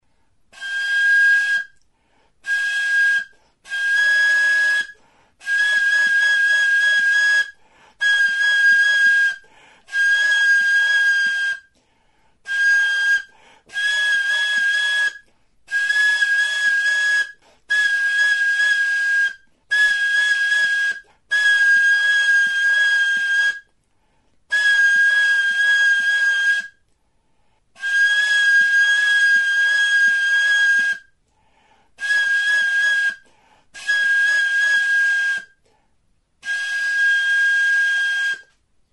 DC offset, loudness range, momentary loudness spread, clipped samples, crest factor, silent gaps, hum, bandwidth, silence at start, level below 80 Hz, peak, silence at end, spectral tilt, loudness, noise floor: under 0.1%; 4 LU; 9 LU; under 0.1%; 12 dB; none; none; 11.5 kHz; 0.6 s; -68 dBFS; -8 dBFS; 0.55 s; 3.5 dB/octave; -16 LUFS; -64 dBFS